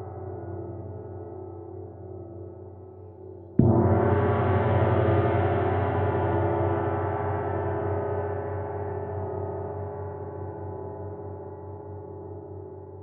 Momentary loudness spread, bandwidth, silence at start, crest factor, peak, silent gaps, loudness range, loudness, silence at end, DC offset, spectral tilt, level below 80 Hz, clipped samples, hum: 18 LU; 3.9 kHz; 0 s; 24 dB; -4 dBFS; none; 13 LU; -27 LUFS; 0 s; under 0.1%; -8.5 dB/octave; -58 dBFS; under 0.1%; 60 Hz at -55 dBFS